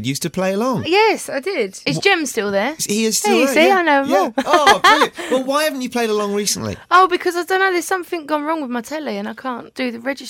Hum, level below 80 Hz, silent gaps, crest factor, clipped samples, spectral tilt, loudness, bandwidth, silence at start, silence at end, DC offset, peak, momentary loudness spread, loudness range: none; -56 dBFS; none; 16 dB; under 0.1%; -3 dB/octave; -17 LUFS; 17 kHz; 0 s; 0 s; under 0.1%; -2 dBFS; 12 LU; 4 LU